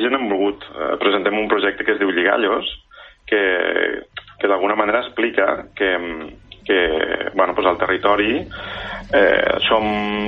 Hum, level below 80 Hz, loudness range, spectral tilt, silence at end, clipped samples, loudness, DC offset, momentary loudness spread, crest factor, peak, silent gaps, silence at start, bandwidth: none; -46 dBFS; 2 LU; -6.5 dB/octave; 0 s; under 0.1%; -18 LUFS; under 0.1%; 12 LU; 16 dB; -2 dBFS; none; 0 s; 5.8 kHz